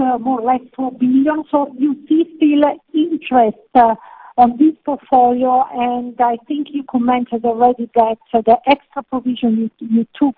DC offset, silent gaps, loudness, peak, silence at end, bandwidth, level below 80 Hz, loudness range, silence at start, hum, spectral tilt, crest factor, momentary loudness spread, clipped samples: under 0.1%; none; -16 LUFS; 0 dBFS; 0.05 s; 4.6 kHz; -54 dBFS; 2 LU; 0 s; none; -9.5 dB/octave; 16 dB; 8 LU; under 0.1%